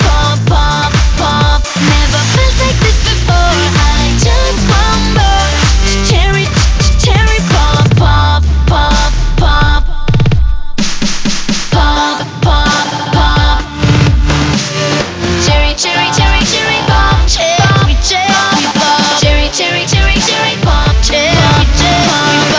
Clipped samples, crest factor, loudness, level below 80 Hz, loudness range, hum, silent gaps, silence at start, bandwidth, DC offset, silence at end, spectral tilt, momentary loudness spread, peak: under 0.1%; 8 dB; -10 LUFS; -12 dBFS; 3 LU; none; none; 0 s; 8 kHz; under 0.1%; 0 s; -4 dB/octave; 4 LU; 0 dBFS